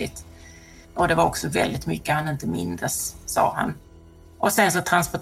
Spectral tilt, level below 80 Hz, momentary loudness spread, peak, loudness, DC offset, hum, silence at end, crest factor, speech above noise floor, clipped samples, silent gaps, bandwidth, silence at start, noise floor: -4 dB/octave; -46 dBFS; 10 LU; -4 dBFS; -23 LUFS; under 0.1%; none; 0 s; 20 dB; 24 dB; under 0.1%; none; 16.5 kHz; 0 s; -48 dBFS